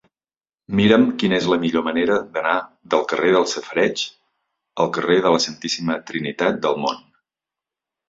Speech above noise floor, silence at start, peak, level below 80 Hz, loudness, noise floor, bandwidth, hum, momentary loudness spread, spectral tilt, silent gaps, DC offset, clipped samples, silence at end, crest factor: over 71 dB; 0.7 s; -2 dBFS; -56 dBFS; -20 LUFS; under -90 dBFS; 7.8 kHz; none; 9 LU; -4.5 dB/octave; none; under 0.1%; under 0.1%; 1.1 s; 18 dB